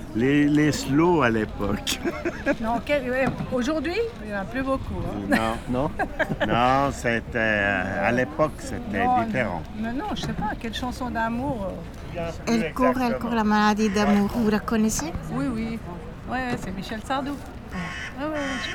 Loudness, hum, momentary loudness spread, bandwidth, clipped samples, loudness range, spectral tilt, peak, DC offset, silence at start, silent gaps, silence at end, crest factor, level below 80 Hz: -25 LUFS; none; 11 LU; 18 kHz; under 0.1%; 5 LU; -5.5 dB/octave; -6 dBFS; under 0.1%; 0 s; none; 0 s; 18 dB; -40 dBFS